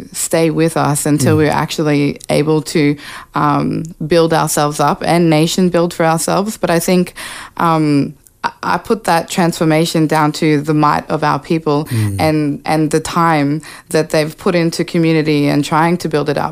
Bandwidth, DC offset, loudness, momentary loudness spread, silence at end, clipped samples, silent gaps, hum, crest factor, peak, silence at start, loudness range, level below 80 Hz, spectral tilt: 16 kHz; under 0.1%; -14 LUFS; 5 LU; 0 s; under 0.1%; none; none; 14 dB; 0 dBFS; 0 s; 2 LU; -46 dBFS; -5.5 dB/octave